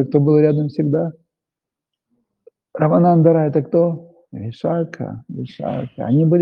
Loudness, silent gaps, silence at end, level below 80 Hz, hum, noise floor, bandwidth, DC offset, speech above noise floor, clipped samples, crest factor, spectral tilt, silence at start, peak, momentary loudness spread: -17 LUFS; none; 0 s; -62 dBFS; none; -86 dBFS; 5.2 kHz; under 0.1%; 69 dB; under 0.1%; 16 dB; -11 dB/octave; 0 s; 0 dBFS; 18 LU